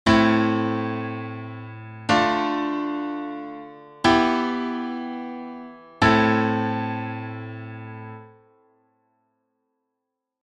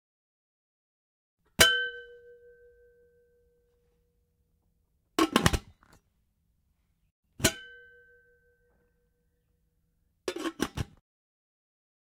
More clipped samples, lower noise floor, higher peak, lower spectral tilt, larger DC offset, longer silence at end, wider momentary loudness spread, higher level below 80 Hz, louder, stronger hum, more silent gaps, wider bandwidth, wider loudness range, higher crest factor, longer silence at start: neither; first, -82 dBFS vs -74 dBFS; about the same, -4 dBFS vs -2 dBFS; first, -6 dB/octave vs -2.5 dB/octave; neither; first, 2.15 s vs 1.25 s; second, 19 LU vs 22 LU; about the same, -50 dBFS vs -50 dBFS; first, -23 LUFS vs -28 LUFS; neither; second, none vs 7.11-7.23 s; second, 10 kHz vs 16 kHz; about the same, 11 LU vs 11 LU; second, 20 dB vs 34 dB; second, 0.05 s vs 1.6 s